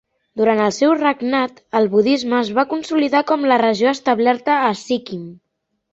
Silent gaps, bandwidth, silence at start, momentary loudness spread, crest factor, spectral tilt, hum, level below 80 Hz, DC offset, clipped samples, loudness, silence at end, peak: none; 8 kHz; 0.35 s; 8 LU; 14 dB; -5 dB/octave; none; -62 dBFS; under 0.1%; under 0.1%; -17 LUFS; 0.6 s; -2 dBFS